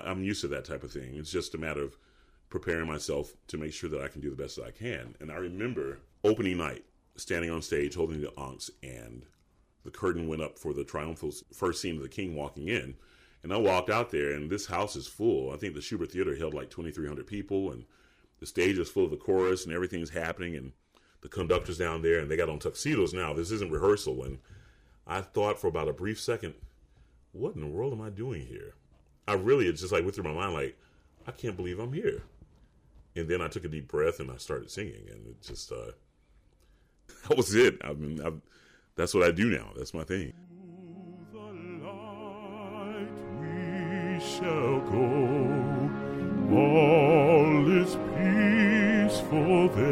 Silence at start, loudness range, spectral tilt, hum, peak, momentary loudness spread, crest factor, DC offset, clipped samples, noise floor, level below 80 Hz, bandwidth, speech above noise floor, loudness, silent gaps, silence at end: 0 s; 13 LU; -6 dB/octave; none; -10 dBFS; 19 LU; 20 dB; under 0.1%; under 0.1%; -66 dBFS; -54 dBFS; 16 kHz; 36 dB; -30 LUFS; none; 0 s